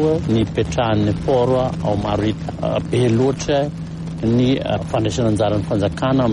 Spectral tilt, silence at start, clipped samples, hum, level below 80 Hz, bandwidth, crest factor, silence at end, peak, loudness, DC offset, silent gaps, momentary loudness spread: -7 dB/octave; 0 s; under 0.1%; none; -36 dBFS; 11 kHz; 12 dB; 0 s; -6 dBFS; -19 LUFS; under 0.1%; none; 6 LU